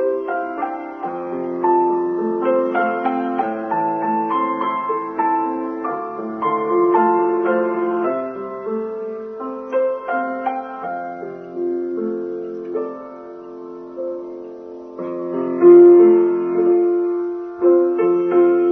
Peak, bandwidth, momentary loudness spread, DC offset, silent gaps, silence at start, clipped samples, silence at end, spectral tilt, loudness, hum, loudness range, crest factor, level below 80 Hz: -2 dBFS; 3.4 kHz; 14 LU; under 0.1%; none; 0 s; under 0.1%; 0 s; -9.5 dB/octave; -18 LUFS; none; 13 LU; 16 dB; -68 dBFS